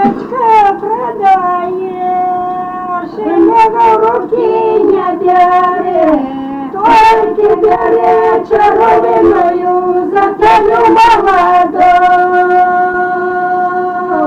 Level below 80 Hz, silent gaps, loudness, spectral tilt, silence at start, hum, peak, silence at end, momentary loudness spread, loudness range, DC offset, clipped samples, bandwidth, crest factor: -40 dBFS; none; -9 LUFS; -6 dB/octave; 0 s; none; -2 dBFS; 0 s; 9 LU; 3 LU; under 0.1%; under 0.1%; 10 kHz; 8 dB